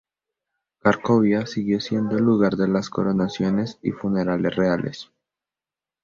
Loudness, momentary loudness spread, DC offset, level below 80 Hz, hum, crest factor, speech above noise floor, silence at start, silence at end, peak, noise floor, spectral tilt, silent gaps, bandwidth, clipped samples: -22 LUFS; 7 LU; under 0.1%; -56 dBFS; none; 20 dB; over 69 dB; 0.85 s; 1 s; -2 dBFS; under -90 dBFS; -7 dB/octave; none; 7.4 kHz; under 0.1%